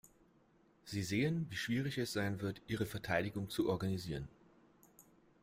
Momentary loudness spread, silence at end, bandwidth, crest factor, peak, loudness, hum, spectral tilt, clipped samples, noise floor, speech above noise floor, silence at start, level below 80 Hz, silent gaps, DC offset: 9 LU; 1.15 s; 16 kHz; 18 dB; -22 dBFS; -39 LUFS; none; -5.5 dB/octave; under 0.1%; -70 dBFS; 32 dB; 0.85 s; -64 dBFS; none; under 0.1%